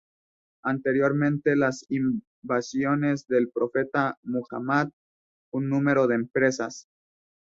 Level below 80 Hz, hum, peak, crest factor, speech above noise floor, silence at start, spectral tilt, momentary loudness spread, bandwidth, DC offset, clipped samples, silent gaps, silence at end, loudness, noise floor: -68 dBFS; none; -8 dBFS; 18 dB; over 65 dB; 0.65 s; -6.5 dB/octave; 9 LU; 7.8 kHz; under 0.1%; under 0.1%; 2.27-2.42 s, 4.17-4.23 s, 4.93-5.52 s; 0.8 s; -26 LUFS; under -90 dBFS